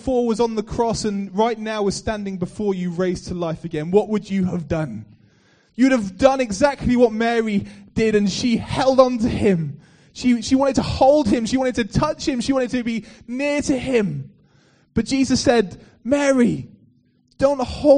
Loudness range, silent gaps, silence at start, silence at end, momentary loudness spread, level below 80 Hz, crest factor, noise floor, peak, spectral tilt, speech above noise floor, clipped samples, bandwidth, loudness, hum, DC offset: 5 LU; none; 0.05 s; 0 s; 9 LU; -42 dBFS; 20 dB; -59 dBFS; 0 dBFS; -5.5 dB/octave; 40 dB; under 0.1%; 10 kHz; -20 LUFS; none; under 0.1%